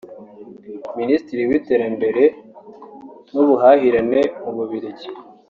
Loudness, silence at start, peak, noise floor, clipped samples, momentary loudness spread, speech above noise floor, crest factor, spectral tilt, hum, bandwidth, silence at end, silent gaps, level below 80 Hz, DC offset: -17 LUFS; 0.05 s; -2 dBFS; -40 dBFS; under 0.1%; 21 LU; 24 dB; 18 dB; -5 dB/octave; none; 6.8 kHz; 0.25 s; none; -58 dBFS; under 0.1%